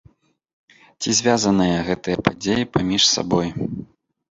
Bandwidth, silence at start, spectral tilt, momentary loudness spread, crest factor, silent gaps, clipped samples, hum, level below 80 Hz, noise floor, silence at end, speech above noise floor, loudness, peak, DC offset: 8.2 kHz; 1 s; -3.5 dB/octave; 12 LU; 20 dB; none; under 0.1%; none; -48 dBFS; -55 dBFS; 0.45 s; 36 dB; -19 LUFS; -2 dBFS; under 0.1%